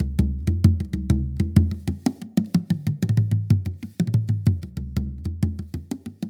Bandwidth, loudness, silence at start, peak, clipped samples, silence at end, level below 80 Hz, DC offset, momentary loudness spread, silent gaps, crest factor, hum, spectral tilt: 16 kHz; -24 LUFS; 0 s; -2 dBFS; under 0.1%; 0 s; -32 dBFS; under 0.1%; 10 LU; none; 20 dB; none; -8 dB/octave